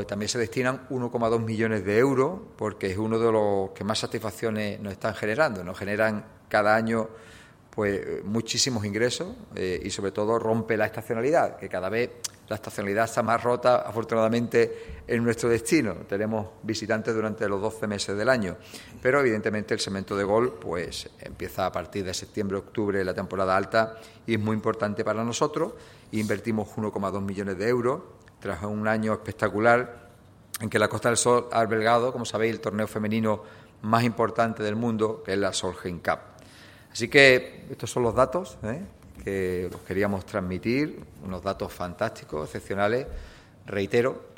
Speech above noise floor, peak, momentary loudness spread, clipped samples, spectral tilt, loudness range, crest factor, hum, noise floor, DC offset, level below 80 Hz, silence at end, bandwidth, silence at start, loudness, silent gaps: 26 dB; 0 dBFS; 11 LU; under 0.1%; -5 dB/octave; 5 LU; 26 dB; none; -52 dBFS; under 0.1%; -54 dBFS; 0.05 s; 16.5 kHz; 0 s; -26 LUFS; none